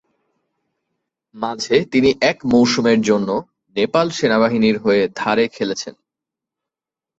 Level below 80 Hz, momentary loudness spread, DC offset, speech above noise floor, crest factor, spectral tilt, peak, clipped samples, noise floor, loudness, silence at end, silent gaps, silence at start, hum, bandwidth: -56 dBFS; 11 LU; under 0.1%; 71 dB; 18 dB; -5 dB/octave; 0 dBFS; under 0.1%; -88 dBFS; -17 LUFS; 1.3 s; none; 1.35 s; none; 8 kHz